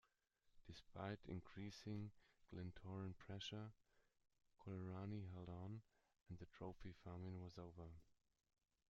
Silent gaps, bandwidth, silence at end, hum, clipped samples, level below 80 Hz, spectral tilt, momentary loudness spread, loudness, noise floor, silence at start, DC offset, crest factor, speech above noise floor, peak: none; 7.4 kHz; 0.75 s; none; under 0.1%; -74 dBFS; -6 dB/octave; 9 LU; -56 LUFS; -84 dBFS; 0.45 s; under 0.1%; 20 dB; 30 dB; -36 dBFS